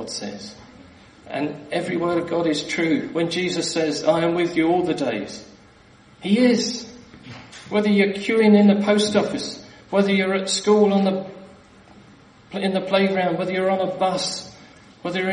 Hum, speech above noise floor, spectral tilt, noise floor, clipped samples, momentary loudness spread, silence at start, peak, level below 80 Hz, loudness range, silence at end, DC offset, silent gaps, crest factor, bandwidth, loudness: none; 30 dB; -5 dB/octave; -50 dBFS; under 0.1%; 17 LU; 0 s; -4 dBFS; -60 dBFS; 5 LU; 0 s; under 0.1%; none; 18 dB; 10.5 kHz; -21 LUFS